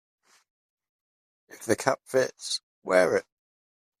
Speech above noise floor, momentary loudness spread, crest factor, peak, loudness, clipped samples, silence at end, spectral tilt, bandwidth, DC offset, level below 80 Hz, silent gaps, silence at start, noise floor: over 64 dB; 10 LU; 26 dB; -4 dBFS; -27 LUFS; under 0.1%; 0.8 s; -3.5 dB/octave; 15 kHz; under 0.1%; -70 dBFS; 2.63-2.82 s; 1.55 s; under -90 dBFS